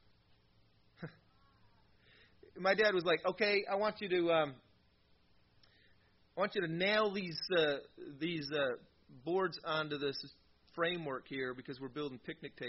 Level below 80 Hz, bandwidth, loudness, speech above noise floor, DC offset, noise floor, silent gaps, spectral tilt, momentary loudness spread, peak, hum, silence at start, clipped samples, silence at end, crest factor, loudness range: -74 dBFS; 5.8 kHz; -36 LUFS; 35 dB; under 0.1%; -71 dBFS; none; -2.5 dB/octave; 16 LU; -18 dBFS; none; 1 s; under 0.1%; 0 s; 20 dB; 5 LU